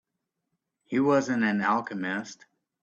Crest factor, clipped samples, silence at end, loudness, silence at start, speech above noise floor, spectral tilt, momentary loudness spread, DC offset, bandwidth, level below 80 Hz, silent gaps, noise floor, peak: 16 dB; under 0.1%; 0.5 s; -27 LUFS; 0.9 s; 57 dB; -6 dB/octave; 9 LU; under 0.1%; 7.8 kHz; -72 dBFS; none; -83 dBFS; -12 dBFS